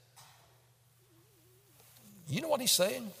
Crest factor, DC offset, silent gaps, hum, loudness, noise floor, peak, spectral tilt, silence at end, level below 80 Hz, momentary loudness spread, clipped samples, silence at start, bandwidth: 22 dB; under 0.1%; none; none; -30 LUFS; -66 dBFS; -16 dBFS; -2.5 dB/octave; 0 s; -80 dBFS; 13 LU; under 0.1%; 0.15 s; 16 kHz